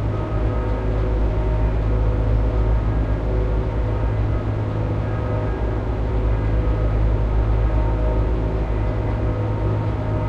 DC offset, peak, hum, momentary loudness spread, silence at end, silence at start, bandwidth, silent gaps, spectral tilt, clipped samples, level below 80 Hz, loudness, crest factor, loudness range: under 0.1%; -8 dBFS; none; 3 LU; 0 s; 0 s; 4.7 kHz; none; -9.5 dB/octave; under 0.1%; -22 dBFS; -22 LUFS; 12 dB; 1 LU